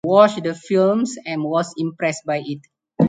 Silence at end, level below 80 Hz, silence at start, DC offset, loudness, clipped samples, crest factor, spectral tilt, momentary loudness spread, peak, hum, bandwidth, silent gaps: 0 s; -66 dBFS; 0.05 s; under 0.1%; -20 LUFS; under 0.1%; 18 dB; -6 dB/octave; 11 LU; 0 dBFS; none; 9.4 kHz; none